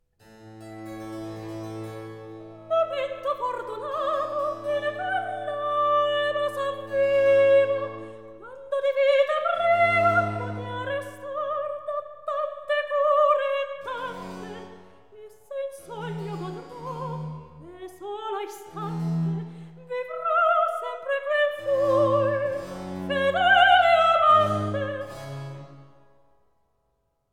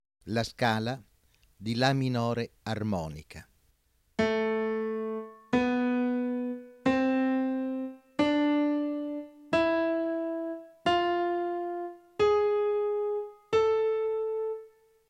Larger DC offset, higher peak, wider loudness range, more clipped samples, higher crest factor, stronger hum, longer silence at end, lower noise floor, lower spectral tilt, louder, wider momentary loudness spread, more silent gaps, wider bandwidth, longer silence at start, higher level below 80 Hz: first, 0.2% vs under 0.1%; first, -6 dBFS vs -10 dBFS; first, 13 LU vs 3 LU; neither; about the same, 20 dB vs 20 dB; neither; first, 1.5 s vs 0.4 s; first, -73 dBFS vs -69 dBFS; about the same, -5.5 dB/octave vs -6.5 dB/octave; first, -24 LUFS vs -29 LUFS; first, 20 LU vs 11 LU; neither; about the same, 13 kHz vs 14 kHz; about the same, 0.3 s vs 0.25 s; about the same, -64 dBFS vs -60 dBFS